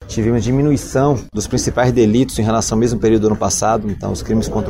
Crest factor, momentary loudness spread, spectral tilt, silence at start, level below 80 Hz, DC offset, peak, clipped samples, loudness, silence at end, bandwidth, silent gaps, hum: 14 dB; 5 LU; -5.5 dB/octave; 0 s; -32 dBFS; under 0.1%; -2 dBFS; under 0.1%; -16 LUFS; 0 s; 16 kHz; none; none